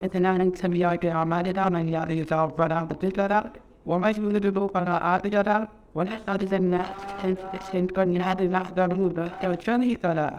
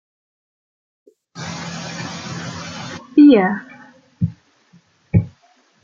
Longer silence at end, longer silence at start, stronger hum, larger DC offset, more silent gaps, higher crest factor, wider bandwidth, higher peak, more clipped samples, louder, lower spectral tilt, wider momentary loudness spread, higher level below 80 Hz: second, 0 s vs 0.55 s; second, 0 s vs 1.35 s; neither; neither; neither; about the same, 16 dB vs 18 dB; first, 9.8 kHz vs 7.6 kHz; second, -8 dBFS vs -2 dBFS; neither; second, -25 LUFS vs -18 LUFS; first, -8 dB/octave vs -6.5 dB/octave; second, 6 LU vs 20 LU; about the same, -52 dBFS vs -48 dBFS